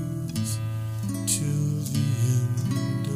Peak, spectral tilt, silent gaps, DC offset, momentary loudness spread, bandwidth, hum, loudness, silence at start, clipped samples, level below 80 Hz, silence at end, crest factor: -10 dBFS; -5.5 dB/octave; none; under 0.1%; 6 LU; 15.5 kHz; none; -26 LUFS; 0 s; under 0.1%; -52 dBFS; 0 s; 16 dB